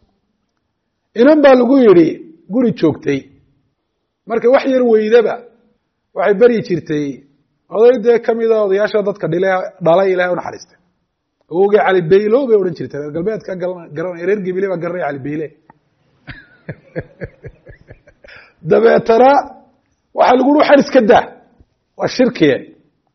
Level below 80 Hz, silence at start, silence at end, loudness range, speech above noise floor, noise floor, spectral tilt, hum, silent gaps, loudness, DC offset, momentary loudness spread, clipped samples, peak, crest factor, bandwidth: -54 dBFS; 1.15 s; 0.5 s; 10 LU; 58 dB; -70 dBFS; -5 dB/octave; none; none; -13 LUFS; under 0.1%; 18 LU; under 0.1%; 0 dBFS; 14 dB; 6.4 kHz